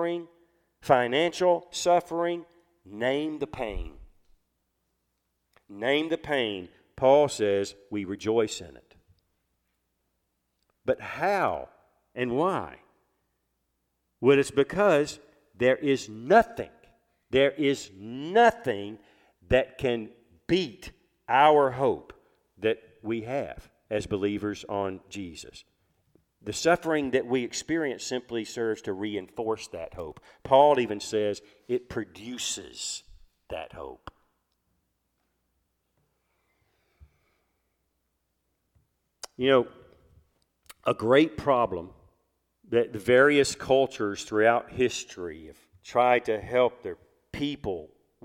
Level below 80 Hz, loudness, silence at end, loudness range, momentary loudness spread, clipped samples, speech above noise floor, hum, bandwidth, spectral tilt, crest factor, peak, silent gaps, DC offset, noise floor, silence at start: -54 dBFS; -26 LUFS; 0.4 s; 9 LU; 18 LU; under 0.1%; 51 dB; none; 15.5 kHz; -4.5 dB/octave; 22 dB; -6 dBFS; none; under 0.1%; -78 dBFS; 0 s